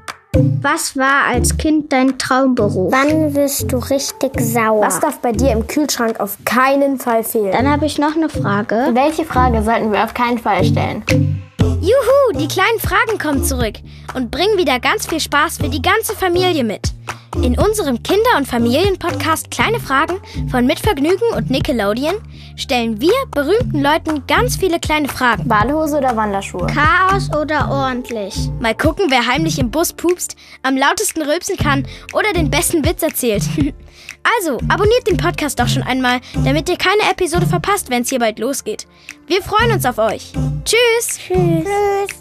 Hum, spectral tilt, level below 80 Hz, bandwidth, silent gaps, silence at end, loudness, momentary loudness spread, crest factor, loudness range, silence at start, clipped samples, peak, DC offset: none; -4.5 dB/octave; -30 dBFS; 15 kHz; none; 0 s; -15 LUFS; 7 LU; 14 dB; 2 LU; 0.1 s; under 0.1%; 0 dBFS; under 0.1%